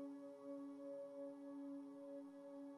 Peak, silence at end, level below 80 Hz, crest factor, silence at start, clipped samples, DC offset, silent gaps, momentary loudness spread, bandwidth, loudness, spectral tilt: -42 dBFS; 0 s; under -90 dBFS; 10 dB; 0 s; under 0.1%; under 0.1%; none; 3 LU; 11 kHz; -54 LUFS; -6.5 dB/octave